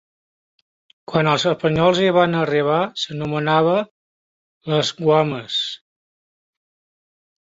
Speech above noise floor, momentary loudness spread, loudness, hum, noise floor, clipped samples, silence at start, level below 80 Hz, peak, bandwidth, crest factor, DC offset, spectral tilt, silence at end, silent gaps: over 72 dB; 8 LU; -19 LUFS; none; under -90 dBFS; under 0.1%; 1.1 s; -56 dBFS; -2 dBFS; 7.8 kHz; 18 dB; under 0.1%; -5.5 dB/octave; 1.8 s; 3.91-4.61 s